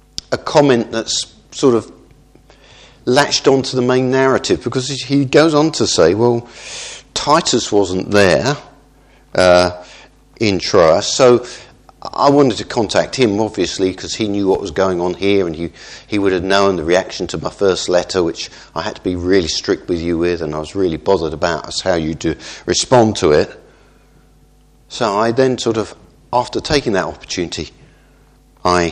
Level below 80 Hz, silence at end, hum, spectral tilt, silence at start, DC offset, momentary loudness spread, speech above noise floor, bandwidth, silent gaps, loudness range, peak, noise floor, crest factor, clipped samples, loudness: -42 dBFS; 0 s; none; -4.5 dB/octave; 0.3 s; under 0.1%; 12 LU; 34 dB; 12 kHz; none; 4 LU; 0 dBFS; -49 dBFS; 16 dB; under 0.1%; -15 LUFS